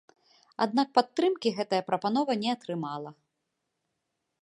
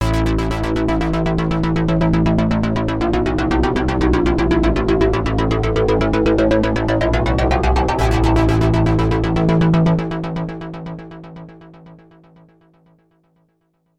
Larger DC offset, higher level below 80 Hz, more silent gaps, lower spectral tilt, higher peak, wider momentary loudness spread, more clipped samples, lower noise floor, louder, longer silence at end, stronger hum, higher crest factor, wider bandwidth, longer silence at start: neither; second, -82 dBFS vs -24 dBFS; neither; second, -5.5 dB/octave vs -7.5 dB/octave; about the same, -6 dBFS vs -4 dBFS; first, 12 LU vs 9 LU; neither; first, -82 dBFS vs -64 dBFS; second, -28 LUFS vs -17 LUFS; second, 1.3 s vs 2.05 s; neither; first, 24 dB vs 14 dB; about the same, 11 kHz vs 11 kHz; first, 0.6 s vs 0 s